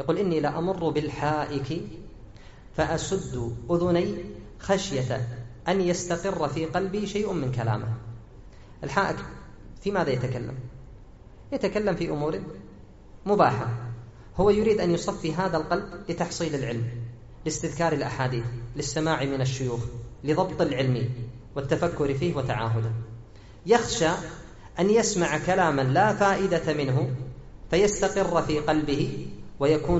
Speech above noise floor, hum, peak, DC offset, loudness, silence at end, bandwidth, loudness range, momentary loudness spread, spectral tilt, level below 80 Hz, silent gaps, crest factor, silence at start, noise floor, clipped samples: 21 dB; none; -6 dBFS; under 0.1%; -26 LUFS; 0 s; 8 kHz; 6 LU; 15 LU; -5.5 dB/octave; -46 dBFS; none; 20 dB; 0 s; -47 dBFS; under 0.1%